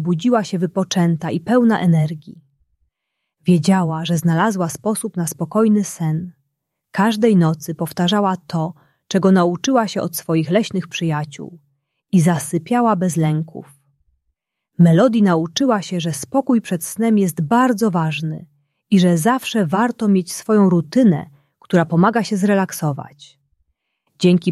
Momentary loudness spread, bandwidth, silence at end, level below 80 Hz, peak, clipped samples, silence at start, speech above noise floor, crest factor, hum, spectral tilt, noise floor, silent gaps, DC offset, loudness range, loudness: 10 LU; 13.5 kHz; 0 s; -60 dBFS; -2 dBFS; under 0.1%; 0 s; 61 dB; 16 dB; none; -6 dB/octave; -77 dBFS; none; under 0.1%; 3 LU; -17 LUFS